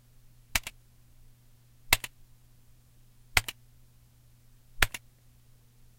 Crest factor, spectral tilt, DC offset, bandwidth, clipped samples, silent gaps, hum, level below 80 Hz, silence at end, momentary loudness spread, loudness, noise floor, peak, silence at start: 36 dB; -1 dB/octave; under 0.1%; 16.5 kHz; under 0.1%; none; none; -46 dBFS; 1 s; 17 LU; -30 LUFS; -59 dBFS; 0 dBFS; 0.55 s